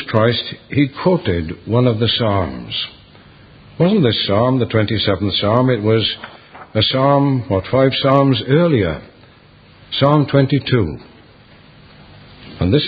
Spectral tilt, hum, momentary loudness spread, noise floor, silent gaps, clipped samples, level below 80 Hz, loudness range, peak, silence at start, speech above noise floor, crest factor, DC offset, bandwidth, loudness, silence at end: -9.5 dB/octave; none; 9 LU; -46 dBFS; none; under 0.1%; -38 dBFS; 3 LU; 0 dBFS; 0 s; 30 dB; 16 dB; under 0.1%; 5 kHz; -16 LUFS; 0 s